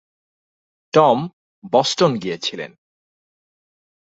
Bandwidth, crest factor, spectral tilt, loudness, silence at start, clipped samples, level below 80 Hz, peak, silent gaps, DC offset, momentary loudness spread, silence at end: 8 kHz; 20 dB; -4.5 dB/octave; -18 LUFS; 0.95 s; under 0.1%; -66 dBFS; -2 dBFS; 1.33-1.62 s; under 0.1%; 18 LU; 1.5 s